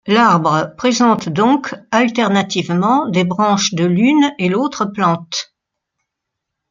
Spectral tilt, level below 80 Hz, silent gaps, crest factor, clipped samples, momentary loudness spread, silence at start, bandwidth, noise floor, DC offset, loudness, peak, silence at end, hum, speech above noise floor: -5 dB/octave; -58 dBFS; none; 14 dB; under 0.1%; 6 LU; 0.05 s; 7.6 kHz; -79 dBFS; under 0.1%; -15 LUFS; 0 dBFS; 1.3 s; none; 64 dB